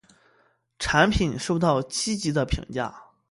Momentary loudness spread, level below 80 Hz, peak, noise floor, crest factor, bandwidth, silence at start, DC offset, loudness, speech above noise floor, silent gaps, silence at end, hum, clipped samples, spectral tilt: 11 LU; -38 dBFS; -4 dBFS; -65 dBFS; 22 dB; 11.5 kHz; 0.8 s; under 0.1%; -24 LUFS; 41 dB; none; 0.25 s; none; under 0.1%; -4.5 dB/octave